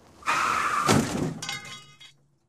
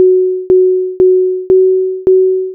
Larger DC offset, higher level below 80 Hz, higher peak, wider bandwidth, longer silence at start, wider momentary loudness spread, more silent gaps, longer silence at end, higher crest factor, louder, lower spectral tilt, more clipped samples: neither; second, -54 dBFS vs -46 dBFS; about the same, -4 dBFS vs -2 dBFS; first, 15.5 kHz vs 1.3 kHz; first, 0.2 s vs 0 s; first, 15 LU vs 3 LU; neither; first, 0.4 s vs 0 s; first, 24 dB vs 8 dB; second, -26 LUFS vs -10 LUFS; second, -4 dB/octave vs -12.5 dB/octave; neither